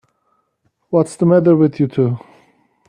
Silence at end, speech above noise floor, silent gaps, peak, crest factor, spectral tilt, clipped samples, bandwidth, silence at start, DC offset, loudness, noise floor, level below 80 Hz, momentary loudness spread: 0.7 s; 52 dB; none; 0 dBFS; 16 dB; -9 dB/octave; under 0.1%; 11 kHz; 0.9 s; under 0.1%; -15 LUFS; -66 dBFS; -60 dBFS; 8 LU